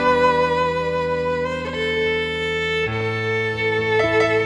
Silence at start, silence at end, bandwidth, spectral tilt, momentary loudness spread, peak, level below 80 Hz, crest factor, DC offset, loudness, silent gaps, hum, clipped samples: 0 s; 0 s; 11 kHz; -5.5 dB/octave; 5 LU; -6 dBFS; -44 dBFS; 14 dB; under 0.1%; -20 LUFS; none; none; under 0.1%